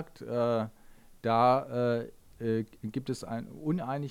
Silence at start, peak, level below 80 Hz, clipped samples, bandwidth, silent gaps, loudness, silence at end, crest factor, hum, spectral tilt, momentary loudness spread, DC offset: 0 s; -12 dBFS; -60 dBFS; under 0.1%; 16 kHz; none; -31 LUFS; 0 s; 18 dB; none; -7.5 dB/octave; 12 LU; under 0.1%